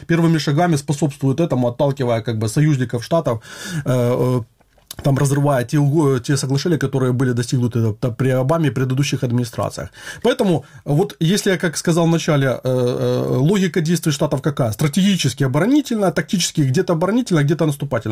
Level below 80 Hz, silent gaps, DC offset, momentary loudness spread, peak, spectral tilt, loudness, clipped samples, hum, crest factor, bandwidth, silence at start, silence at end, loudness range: -50 dBFS; none; 0.1%; 5 LU; -6 dBFS; -6 dB/octave; -18 LUFS; under 0.1%; none; 12 dB; 16 kHz; 0.1 s; 0 s; 2 LU